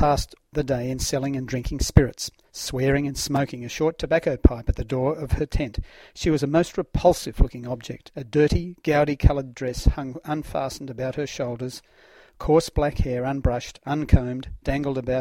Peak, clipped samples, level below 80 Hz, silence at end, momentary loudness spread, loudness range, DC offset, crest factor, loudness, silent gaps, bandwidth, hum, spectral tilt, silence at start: 0 dBFS; under 0.1%; -30 dBFS; 0 s; 11 LU; 3 LU; under 0.1%; 24 dB; -24 LUFS; none; 16.5 kHz; none; -6 dB/octave; 0 s